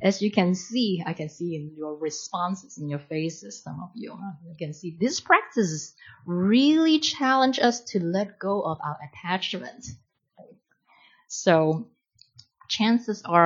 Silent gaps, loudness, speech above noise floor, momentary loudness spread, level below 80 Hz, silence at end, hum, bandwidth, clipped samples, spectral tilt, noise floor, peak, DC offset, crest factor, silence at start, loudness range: none; -25 LUFS; 36 dB; 18 LU; -70 dBFS; 0 s; none; 7.6 kHz; under 0.1%; -4.5 dB/octave; -61 dBFS; -2 dBFS; under 0.1%; 22 dB; 0 s; 10 LU